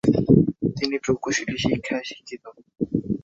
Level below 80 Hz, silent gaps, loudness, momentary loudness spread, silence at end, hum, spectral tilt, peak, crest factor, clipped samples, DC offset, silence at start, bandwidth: -48 dBFS; none; -23 LUFS; 18 LU; 0.05 s; none; -5.5 dB/octave; -2 dBFS; 20 dB; under 0.1%; under 0.1%; 0.05 s; 8 kHz